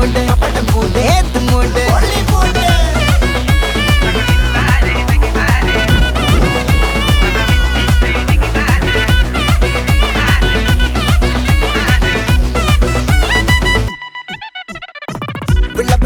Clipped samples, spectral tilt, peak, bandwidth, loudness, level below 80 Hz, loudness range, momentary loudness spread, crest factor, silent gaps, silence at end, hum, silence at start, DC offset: under 0.1%; -5 dB/octave; 0 dBFS; 19.5 kHz; -13 LUFS; -14 dBFS; 1 LU; 4 LU; 12 dB; none; 0 s; none; 0 s; under 0.1%